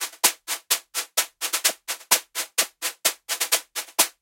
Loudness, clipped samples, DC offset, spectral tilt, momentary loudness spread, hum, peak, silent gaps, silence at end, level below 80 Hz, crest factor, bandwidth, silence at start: -23 LUFS; under 0.1%; under 0.1%; 3 dB/octave; 5 LU; none; -2 dBFS; none; 0.1 s; -82 dBFS; 24 dB; 17 kHz; 0 s